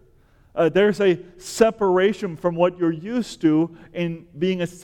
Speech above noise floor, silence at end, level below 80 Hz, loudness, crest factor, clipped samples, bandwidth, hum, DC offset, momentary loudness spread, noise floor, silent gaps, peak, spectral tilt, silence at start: 34 dB; 0.05 s; -54 dBFS; -21 LUFS; 18 dB; under 0.1%; 17 kHz; none; under 0.1%; 10 LU; -55 dBFS; none; -2 dBFS; -6 dB/octave; 0.55 s